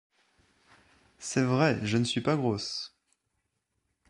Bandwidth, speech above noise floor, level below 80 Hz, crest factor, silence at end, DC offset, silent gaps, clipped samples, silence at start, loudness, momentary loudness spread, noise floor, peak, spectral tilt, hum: 11.5 kHz; 52 dB; -64 dBFS; 20 dB; 1.25 s; under 0.1%; none; under 0.1%; 1.2 s; -28 LUFS; 12 LU; -80 dBFS; -12 dBFS; -5 dB/octave; none